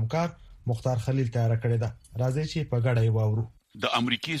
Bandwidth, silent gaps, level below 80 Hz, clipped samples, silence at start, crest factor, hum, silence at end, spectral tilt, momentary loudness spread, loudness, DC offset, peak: 11.5 kHz; none; -52 dBFS; under 0.1%; 0 s; 18 dB; none; 0 s; -6.5 dB/octave; 8 LU; -28 LUFS; under 0.1%; -10 dBFS